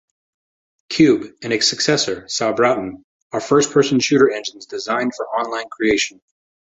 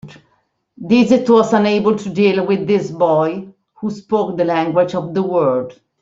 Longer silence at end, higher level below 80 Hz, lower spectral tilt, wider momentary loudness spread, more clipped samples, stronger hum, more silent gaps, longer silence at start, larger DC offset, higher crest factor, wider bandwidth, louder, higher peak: first, 0.6 s vs 0.3 s; about the same, -56 dBFS vs -58 dBFS; second, -3.5 dB/octave vs -7 dB/octave; about the same, 12 LU vs 14 LU; neither; neither; first, 3.04-3.30 s vs none; first, 0.9 s vs 0.05 s; neither; about the same, 18 dB vs 14 dB; about the same, 8.2 kHz vs 7.8 kHz; about the same, -18 LUFS vs -16 LUFS; about the same, -2 dBFS vs -2 dBFS